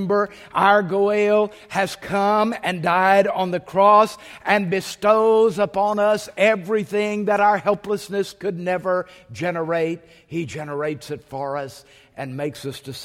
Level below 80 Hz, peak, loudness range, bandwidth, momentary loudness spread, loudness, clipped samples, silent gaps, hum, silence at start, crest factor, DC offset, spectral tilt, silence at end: -60 dBFS; -2 dBFS; 9 LU; 16 kHz; 13 LU; -20 LUFS; under 0.1%; none; none; 0 s; 18 dB; under 0.1%; -5.5 dB/octave; 0 s